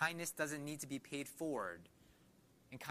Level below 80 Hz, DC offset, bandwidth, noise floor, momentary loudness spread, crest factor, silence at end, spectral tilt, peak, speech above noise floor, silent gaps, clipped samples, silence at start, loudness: -78 dBFS; under 0.1%; 15.5 kHz; -69 dBFS; 11 LU; 22 dB; 0 s; -3.5 dB/octave; -24 dBFS; 25 dB; none; under 0.1%; 0 s; -44 LUFS